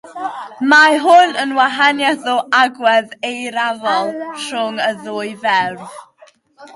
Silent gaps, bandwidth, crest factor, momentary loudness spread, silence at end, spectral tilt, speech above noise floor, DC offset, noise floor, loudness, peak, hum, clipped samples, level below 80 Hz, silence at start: none; 11.5 kHz; 16 dB; 15 LU; 0.05 s; -2.5 dB/octave; 34 dB; under 0.1%; -49 dBFS; -14 LUFS; 0 dBFS; none; under 0.1%; -70 dBFS; 0.05 s